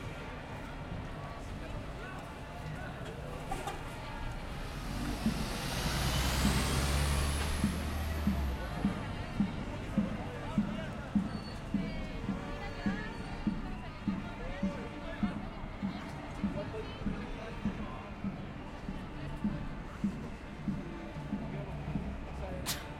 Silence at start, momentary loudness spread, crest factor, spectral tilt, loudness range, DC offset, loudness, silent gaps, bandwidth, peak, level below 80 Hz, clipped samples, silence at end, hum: 0 s; 11 LU; 20 dB; -5 dB/octave; 9 LU; under 0.1%; -38 LUFS; none; 16.5 kHz; -16 dBFS; -42 dBFS; under 0.1%; 0 s; none